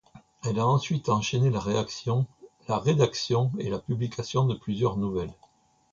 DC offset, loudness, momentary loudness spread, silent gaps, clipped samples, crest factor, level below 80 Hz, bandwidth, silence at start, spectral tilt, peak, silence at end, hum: under 0.1%; -27 LUFS; 7 LU; none; under 0.1%; 18 dB; -54 dBFS; 7.6 kHz; 0.15 s; -6.5 dB/octave; -8 dBFS; 0.6 s; none